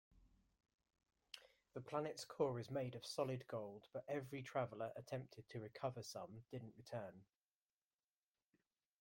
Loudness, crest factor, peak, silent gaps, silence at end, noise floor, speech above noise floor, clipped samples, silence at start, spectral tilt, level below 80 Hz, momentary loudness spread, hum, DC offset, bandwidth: -48 LUFS; 24 dB; -26 dBFS; none; 1.75 s; under -90 dBFS; over 42 dB; under 0.1%; 0.15 s; -5.5 dB/octave; -82 dBFS; 13 LU; none; under 0.1%; 16.5 kHz